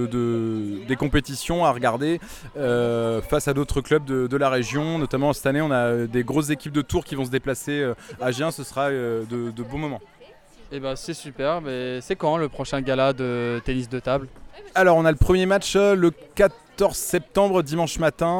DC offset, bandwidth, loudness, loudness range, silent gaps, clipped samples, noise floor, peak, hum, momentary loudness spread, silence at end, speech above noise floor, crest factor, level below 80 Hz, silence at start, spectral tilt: under 0.1%; 18.5 kHz; -23 LUFS; 8 LU; none; under 0.1%; -49 dBFS; -4 dBFS; none; 10 LU; 0 s; 26 dB; 18 dB; -38 dBFS; 0 s; -5.5 dB/octave